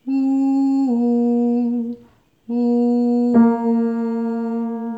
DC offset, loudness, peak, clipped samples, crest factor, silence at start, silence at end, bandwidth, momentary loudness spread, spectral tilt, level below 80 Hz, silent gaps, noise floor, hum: under 0.1%; -18 LUFS; -4 dBFS; under 0.1%; 14 dB; 0.05 s; 0 s; 7.4 kHz; 9 LU; -9 dB/octave; -66 dBFS; none; -51 dBFS; none